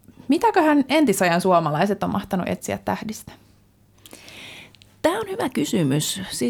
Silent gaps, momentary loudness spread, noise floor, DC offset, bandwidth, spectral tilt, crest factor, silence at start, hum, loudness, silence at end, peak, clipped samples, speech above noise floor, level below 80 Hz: none; 21 LU; -56 dBFS; under 0.1%; 20 kHz; -5 dB/octave; 16 dB; 0.3 s; none; -21 LUFS; 0 s; -6 dBFS; under 0.1%; 35 dB; -56 dBFS